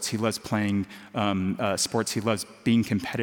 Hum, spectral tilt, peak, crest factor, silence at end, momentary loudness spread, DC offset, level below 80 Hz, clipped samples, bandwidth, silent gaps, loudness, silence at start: none; -4.5 dB/octave; -8 dBFS; 18 dB; 0 s; 4 LU; under 0.1%; -64 dBFS; under 0.1%; 17 kHz; none; -27 LUFS; 0 s